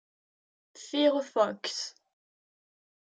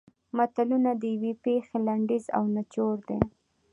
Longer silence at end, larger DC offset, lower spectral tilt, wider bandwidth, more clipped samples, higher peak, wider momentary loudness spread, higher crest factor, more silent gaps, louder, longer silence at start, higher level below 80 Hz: first, 1.2 s vs 0.45 s; neither; second, -3 dB/octave vs -8.5 dB/octave; about the same, 9.4 kHz vs 10 kHz; neither; second, -12 dBFS vs -6 dBFS; first, 13 LU vs 5 LU; about the same, 22 dB vs 22 dB; neither; about the same, -29 LUFS vs -28 LUFS; first, 0.75 s vs 0.35 s; second, under -90 dBFS vs -54 dBFS